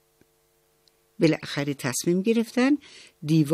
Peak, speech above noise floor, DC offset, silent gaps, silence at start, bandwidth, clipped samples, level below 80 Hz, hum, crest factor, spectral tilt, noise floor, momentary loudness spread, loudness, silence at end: -8 dBFS; 42 dB; under 0.1%; none; 1.2 s; 15 kHz; under 0.1%; -70 dBFS; none; 18 dB; -5.5 dB/octave; -66 dBFS; 5 LU; -25 LUFS; 0 s